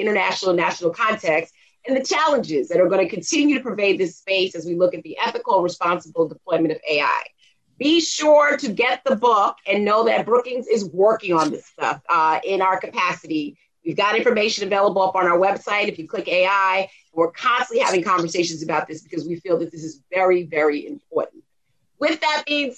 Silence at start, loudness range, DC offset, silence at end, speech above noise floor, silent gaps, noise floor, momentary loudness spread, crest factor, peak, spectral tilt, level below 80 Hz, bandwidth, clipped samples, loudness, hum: 0 s; 4 LU; under 0.1%; 0.05 s; 52 dB; none; -72 dBFS; 9 LU; 16 dB; -4 dBFS; -3.5 dB/octave; -68 dBFS; 9.6 kHz; under 0.1%; -20 LUFS; none